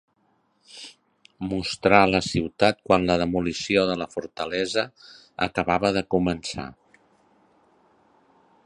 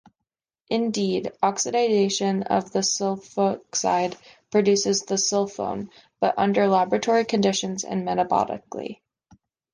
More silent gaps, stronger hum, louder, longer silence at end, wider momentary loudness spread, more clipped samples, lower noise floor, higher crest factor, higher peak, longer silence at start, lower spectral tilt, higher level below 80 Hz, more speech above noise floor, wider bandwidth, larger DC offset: neither; neither; about the same, -23 LUFS vs -23 LUFS; first, 1.95 s vs 0.8 s; first, 17 LU vs 10 LU; neither; second, -67 dBFS vs -85 dBFS; first, 24 dB vs 18 dB; first, 0 dBFS vs -6 dBFS; about the same, 0.75 s vs 0.7 s; about the same, -5 dB/octave vs -4 dB/octave; first, -50 dBFS vs -64 dBFS; second, 44 dB vs 62 dB; about the same, 11 kHz vs 10.5 kHz; neither